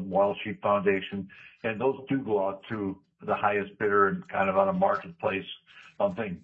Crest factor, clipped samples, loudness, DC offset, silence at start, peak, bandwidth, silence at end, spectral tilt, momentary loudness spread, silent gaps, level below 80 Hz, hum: 20 dB; under 0.1%; -28 LUFS; under 0.1%; 0 s; -8 dBFS; 5.6 kHz; 0.05 s; -8.5 dB/octave; 11 LU; none; -70 dBFS; none